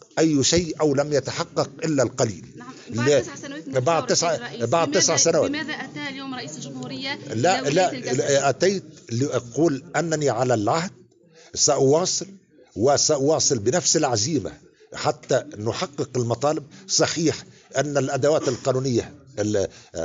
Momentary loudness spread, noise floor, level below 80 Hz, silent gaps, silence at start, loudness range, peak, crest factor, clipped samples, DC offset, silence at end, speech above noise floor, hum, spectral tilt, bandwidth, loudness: 13 LU; -52 dBFS; -58 dBFS; none; 0.15 s; 3 LU; -6 dBFS; 16 dB; under 0.1%; under 0.1%; 0 s; 30 dB; none; -3.5 dB/octave; 9.4 kHz; -22 LUFS